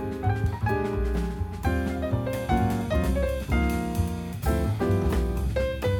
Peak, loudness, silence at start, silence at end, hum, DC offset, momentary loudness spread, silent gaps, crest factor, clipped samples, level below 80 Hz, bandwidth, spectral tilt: -10 dBFS; -27 LUFS; 0 s; 0 s; none; under 0.1%; 4 LU; none; 14 dB; under 0.1%; -30 dBFS; 18 kHz; -7 dB/octave